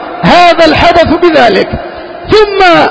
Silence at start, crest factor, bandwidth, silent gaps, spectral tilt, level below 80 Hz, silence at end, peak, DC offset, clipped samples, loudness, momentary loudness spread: 0 s; 6 dB; 8 kHz; none; -5.5 dB/octave; -28 dBFS; 0 s; 0 dBFS; under 0.1%; 7%; -5 LUFS; 13 LU